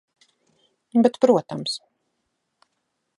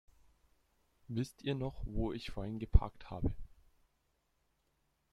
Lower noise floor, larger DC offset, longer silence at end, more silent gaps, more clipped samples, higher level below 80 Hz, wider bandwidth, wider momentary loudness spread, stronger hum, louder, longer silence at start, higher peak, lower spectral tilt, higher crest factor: about the same, -76 dBFS vs -79 dBFS; neither; second, 1.4 s vs 1.65 s; neither; neither; second, -74 dBFS vs -42 dBFS; about the same, 11.5 kHz vs 12 kHz; about the same, 12 LU vs 10 LU; neither; first, -21 LUFS vs -39 LUFS; second, 0.95 s vs 1.1 s; first, -4 dBFS vs -10 dBFS; second, -5.5 dB/octave vs -7.5 dB/octave; second, 22 dB vs 28 dB